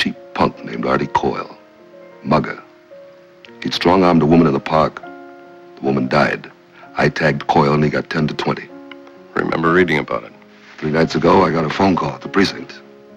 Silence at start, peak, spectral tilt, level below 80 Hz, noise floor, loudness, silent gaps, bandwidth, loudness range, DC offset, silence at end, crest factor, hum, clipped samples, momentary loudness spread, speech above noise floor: 0 s; 0 dBFS; -6.5 dB/octave; -44 dBFS; -42 dBFS; -17 LUFS; none; 10.5 kHz; 4 LU; under 0.1%; 0.4 s; 18 dB; none; under 0.1%; 17 LU; 27 dB